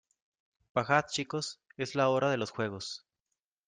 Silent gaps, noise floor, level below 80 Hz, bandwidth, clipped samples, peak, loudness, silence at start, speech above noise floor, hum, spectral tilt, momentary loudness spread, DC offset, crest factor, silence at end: none; -88 dBFS; -74 dBFS; 9.8 kHz; under 0.1%; -10 dBFS; -32 LUFS; 0.75 s; 56 dB; none; -4.5 dB/octave; 12 LU; under 0.1%; 24 dB; 0.7 s